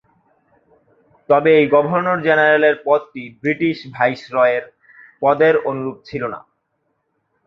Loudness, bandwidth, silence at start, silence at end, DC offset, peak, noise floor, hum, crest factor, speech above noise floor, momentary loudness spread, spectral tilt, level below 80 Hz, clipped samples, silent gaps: -17 LUFS; 6.2 kHz; 1.3 s; 1.1 s; under 0.1%; 0 dBFS; -70 dBFS; none; 18 dB; 53 dB; 14 LU; -7.5 dB/octave; -62 dBFS; under 0.1%; none